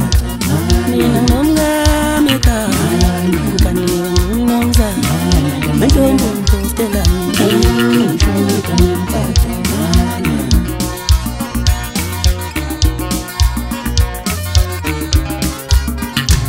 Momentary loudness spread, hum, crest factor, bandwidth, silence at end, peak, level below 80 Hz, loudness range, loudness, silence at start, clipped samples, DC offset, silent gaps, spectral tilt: 6 LU; none; 12 dB; 16.5 kHz; 0 s; 0 dBFS; -18 dBFS; 4 LU; -14 LUFS; 0 s; under 0.1%; under 0.1%; none; -5 dB/octave